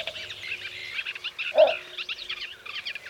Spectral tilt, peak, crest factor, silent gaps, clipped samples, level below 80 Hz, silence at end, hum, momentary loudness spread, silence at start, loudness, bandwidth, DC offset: -1.5 dB/octave; -8 dBFS; 22 dB; none; under 0.1%; -68 dBFS; 0 s; none; 13 LU; 0 s; -28 LUFS; 15.5 kHz; under 0.1%